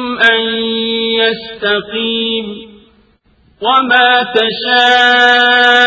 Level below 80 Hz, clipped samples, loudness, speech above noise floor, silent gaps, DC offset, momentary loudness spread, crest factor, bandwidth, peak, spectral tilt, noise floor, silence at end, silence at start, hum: -54 dBFS; 0.2%; -10 LUFS; 40 dB; none; under 0.1%; 10 LU; 12 dB; 8 kHz; 0 dBFS; -3 dB/octave; -51 dBFS; 0 s; 0 s; none